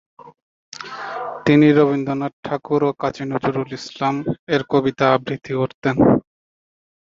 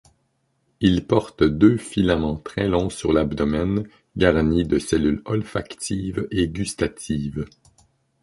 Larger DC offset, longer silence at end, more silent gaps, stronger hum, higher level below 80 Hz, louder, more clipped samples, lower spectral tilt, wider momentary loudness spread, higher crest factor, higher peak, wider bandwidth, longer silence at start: neither; first, 0.9 s vs 0.75 s; first, 0.42-0.72 s, 2.33-2.43 s, 4.39-4.47 s, 5.74-5.82 s vs none; neither; second, -52 dBFS vs -38 dBFS; first, -19 LUFS vs -22 LUFS; neither; first, -7.5 dB/octave vs -6 dB/octave; first, 15 LU vs 10 LU; about the same, 18 dB vs 20 dB; about the same, -2 dBFS vs -2 dBFS; second, 7.4 kHz vs 11.5 kHz; second, 0.25 s vs 0.8 s